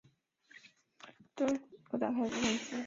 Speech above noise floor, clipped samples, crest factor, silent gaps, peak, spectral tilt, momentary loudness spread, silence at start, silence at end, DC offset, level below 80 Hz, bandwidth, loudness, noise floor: 33 dB; under 0.1%; 18 dB; none; -20 dBFS; -3 dB/octave; 24 LU; 0.55 s; 0 s; under 0.1%; -72 dBFS; 7.6 kHz; -35 LUFS; -67 dBFS